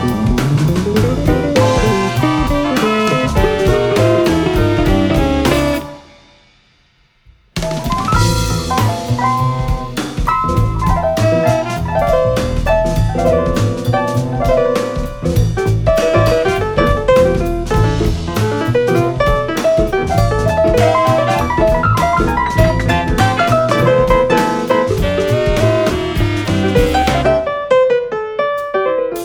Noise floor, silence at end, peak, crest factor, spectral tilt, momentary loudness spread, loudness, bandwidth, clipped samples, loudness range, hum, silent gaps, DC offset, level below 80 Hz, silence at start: -54 dBFS; 0 s; 0 dBFS; 14 dB; -6 dB/octave; 5 LU; -14 LUFS; 19.5 kHz; under 0.1%; 4 LU; none; none; under 0.1%; -24 dBFS; 0 s